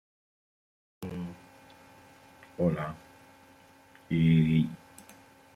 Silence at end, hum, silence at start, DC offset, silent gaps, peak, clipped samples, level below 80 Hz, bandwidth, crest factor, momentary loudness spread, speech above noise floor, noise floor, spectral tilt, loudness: 0.8 s; none; 1 s; under 0.1%; none; -14 dBFS; under 0.1%; -60 dBFS; 11 kHz; 18 dB; 26 LU; 32 dB; -57 dBFS; -8.5 dB/octave; -29 LUFS